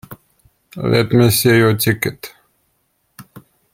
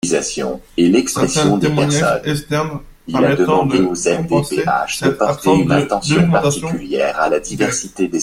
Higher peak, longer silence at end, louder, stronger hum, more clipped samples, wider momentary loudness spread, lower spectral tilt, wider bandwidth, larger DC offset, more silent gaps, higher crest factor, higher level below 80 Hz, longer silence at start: about the same, -2 dBFS vs 0 dBFS; first, 0.35 s vs 0 s; about the same, -14 LUFS vs -16 LUFS; neither; neither; first, 23 LU vs 7 LU; about the same, -5 dB/octave vs -5 dB/octave; about the same, 16.5 kHz vs 16 kHz; neither; neither; about the same, 16 dB vs 16 dB; second, -50 dBFS vs -42 dBFS; about the same, 0.1 s vs 0.05 s